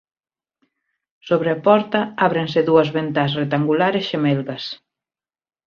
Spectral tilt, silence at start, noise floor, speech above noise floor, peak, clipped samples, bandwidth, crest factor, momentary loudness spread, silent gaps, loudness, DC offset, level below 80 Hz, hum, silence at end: -7.5 dB/octave; 1.25 s; under -90 dBFS; over 72 dB; -2 dBFS; under 0.1%; 6.8 kHz; 18 dB; 9 LU; none; -19 LUFS; under 0.1%; -62 dBFS; none; 0.9 s